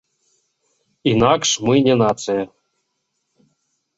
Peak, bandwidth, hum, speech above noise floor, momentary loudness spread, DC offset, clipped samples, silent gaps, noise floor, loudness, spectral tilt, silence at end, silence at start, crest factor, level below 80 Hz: -2 dBFS; 8 kHz; none; 57 dB; 9 LU; under 0.1%; under 0.1%; none; -73 dBFS; -17 LUFS; -4.5 dB/octave; 1.5 s; 1.05 s; 18 dB; -52 dBFS